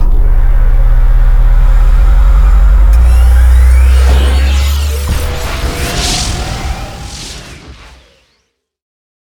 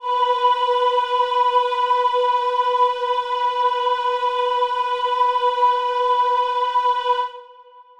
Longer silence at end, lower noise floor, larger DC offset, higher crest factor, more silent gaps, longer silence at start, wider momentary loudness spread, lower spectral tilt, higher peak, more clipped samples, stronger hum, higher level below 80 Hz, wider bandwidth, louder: first, 1.6 s vs 0.2 s; first, -61 dBFS vs -46 dBFS; neither; about the same, 8 dB vs 12 dB; neither; about the same, 0 s vs 0 s; first, 15 LU vs 3 LU; first, -4.5 dB/octave vs 0.5 dB/octave; first, 0 dBFS vs -6 dBFS; neither; neither; first, -8 dBFS vs -66 dBFS; first, 17.5 kHz vs 9.4 kHz; first, -11 LUFS vs -19 LUFS